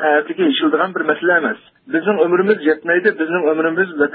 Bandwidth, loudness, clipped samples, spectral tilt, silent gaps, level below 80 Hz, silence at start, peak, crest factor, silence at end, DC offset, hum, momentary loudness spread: 4.7 kHz; -16 LUFS; under 0.1%; -10.5 dB/octave; none; -66 dBFS; 0 s; -2 dBFS; 14 dB; 0 s; under 0.1%; none; 4 LU